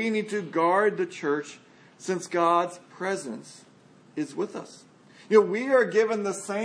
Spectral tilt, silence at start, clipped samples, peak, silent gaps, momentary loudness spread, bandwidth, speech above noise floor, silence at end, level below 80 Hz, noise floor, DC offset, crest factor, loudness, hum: -5 dB/octave; 0 s; under 0.1%; -6 dBFS; none; 17 LU; 10.5 kHz; 29 dB; 0 s; -84 dBFS; -55 dBFS; under 0.1%; 20 dB; -26 LUFS; none